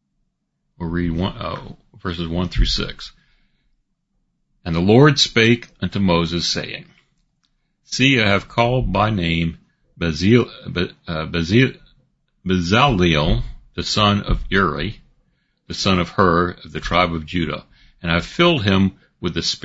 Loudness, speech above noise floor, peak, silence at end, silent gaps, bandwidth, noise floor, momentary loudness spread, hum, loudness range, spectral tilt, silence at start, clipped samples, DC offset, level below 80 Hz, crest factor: -18 LUFS; 53 dB; 0 dBFS; 0.05 s; none; 8 kHz; -71 dBFS; 14 LU; none; 7 LU; -5.5 dB/octave; 0.8 s; under 0.1%; under 0.1%; -32 dBFS; 20 dB